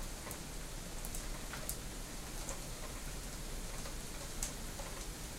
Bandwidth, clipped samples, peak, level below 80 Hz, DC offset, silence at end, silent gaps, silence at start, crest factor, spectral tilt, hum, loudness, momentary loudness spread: 16 kHz; under 0.1%; -18 dBFS; -46 dBFS; under 0.1%; 0 s; none; 0 s; 26 dB; -3 dB/octave; none; -44 LUFS; 4 LU